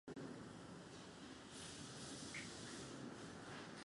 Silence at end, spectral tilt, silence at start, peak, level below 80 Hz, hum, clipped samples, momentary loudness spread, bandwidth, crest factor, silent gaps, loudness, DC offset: 0 s; -3.5 dB/octave; 0.05 s; -38 dBFS; -74 dBFS; none; under 0.1%; 6 LU; 11.5 kHz; 16 dB; none; -53 LUFS; under 0.1%